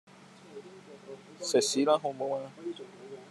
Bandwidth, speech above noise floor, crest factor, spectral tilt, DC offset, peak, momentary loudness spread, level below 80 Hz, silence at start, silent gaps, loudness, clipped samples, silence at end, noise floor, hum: 13 kHz; 22 dB; 22 dB; -3 dB/octave; under 0.1%; -12 dBFS; 23 LU; -90 dBFS; 0.2 s; none; -30 LUFS; under 0.1%; 0 s; -52 dBFS; none